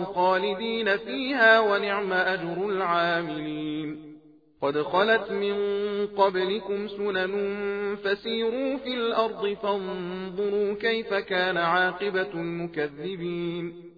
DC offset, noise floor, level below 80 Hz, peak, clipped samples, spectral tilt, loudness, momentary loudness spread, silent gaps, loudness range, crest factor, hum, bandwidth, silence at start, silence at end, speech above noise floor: under 0.1%; -52 dBFS; -64 dBFS; -6 dBFS; under 0.1%; -7 dB/octave; -26 LUFS; 9 LU; none; 4 LU; 20 dB; none; 5 kHz; 0 s; 0.05 s; 26 dB